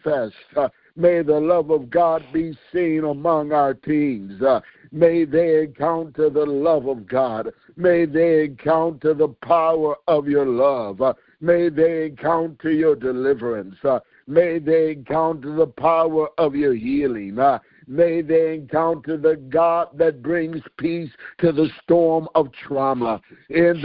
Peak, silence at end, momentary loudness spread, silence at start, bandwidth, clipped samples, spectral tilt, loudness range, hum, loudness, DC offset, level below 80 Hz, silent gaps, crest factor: -2 dBFS; 0 s; 7 LU; 0.05 s; 5 kHz; under 0.1%; -12 dB/octave; 2 LU; none; -20 LUFS; under 0.1%; -56 dBFS; none; 18 dB